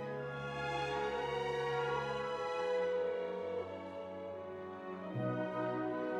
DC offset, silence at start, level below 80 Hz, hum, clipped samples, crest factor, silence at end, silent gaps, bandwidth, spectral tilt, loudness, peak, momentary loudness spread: under 0.1%; 0 s; -66 dBFS; none; under 0.1%; 12 dB; 0 s; none; 10.5 kHz; -6 dB/octave; -39 LUFS; -26 dBFS; 9 LU